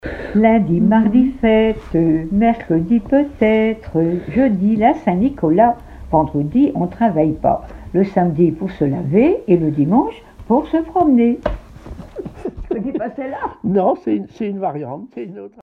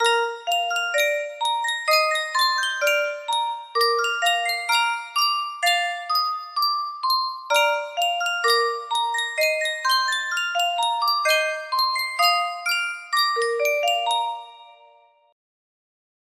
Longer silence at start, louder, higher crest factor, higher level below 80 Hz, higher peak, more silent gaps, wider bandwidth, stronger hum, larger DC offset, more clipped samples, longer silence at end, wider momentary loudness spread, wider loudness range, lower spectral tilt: about the same, 0.05 s vs 0 s; first, -16 LUFS vs -21 LUFS; about the same, 16 dB vs 16 dB; first, -38 dBFS vs -78 dBFS; first, 0 dBFS vs -6 dBFS; neither; second, 4.8 kHz vs 16 kHz; neither; neither; neither; second, 0.15 s vs 1.6 s; first, 14 LU vs 5 LU; first, 7 LU vs 1 LU; first, -10 dB/octave vs 3.5 dB/octave